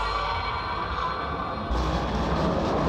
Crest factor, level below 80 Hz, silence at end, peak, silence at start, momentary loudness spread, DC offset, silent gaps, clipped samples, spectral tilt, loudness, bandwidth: 14 dB; -34 dBFS; 0 s; -14 dBFS; 0 s; 4 LU; under 0.1%; none; under 0.1%; -6 dB/octave; -27 LUFS; 9.8 kHz